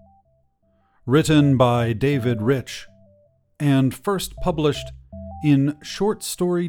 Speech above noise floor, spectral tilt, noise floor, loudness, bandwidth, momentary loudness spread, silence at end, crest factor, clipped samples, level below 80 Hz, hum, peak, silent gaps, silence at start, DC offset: 44 dB; -6.5 dB/octave; -63 dBFS; -21 LUFS; 17.5 kHz; 18 LU; 0 s; 18 dB; under 0.1%; -44 dBFS; none; -4 dBFS; none; 1.05 s; under 0.1%